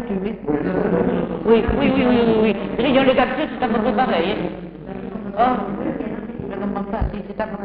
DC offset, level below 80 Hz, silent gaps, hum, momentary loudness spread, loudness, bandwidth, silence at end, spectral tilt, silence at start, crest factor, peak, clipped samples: under 0.1%; -36 dBFS; none; none; 12 LU; -20 LUFS; 5 kHz; 0 s; -5 dB/octave; 0 s; 16 dB; -4 dBFS; under 0.1%